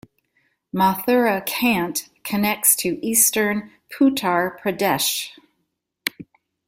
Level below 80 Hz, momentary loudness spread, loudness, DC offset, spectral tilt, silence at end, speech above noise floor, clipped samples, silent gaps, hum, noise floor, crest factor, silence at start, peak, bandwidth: -60 dBFS; 13 LU; -20 LUFS; under 0.1%; -3 dB/octave; 0.45 s; 54 dB; under 0.1%; none; none; -75 dBFS; 20 dB; 0.75 s; -2 dBFS; 16.5 kHz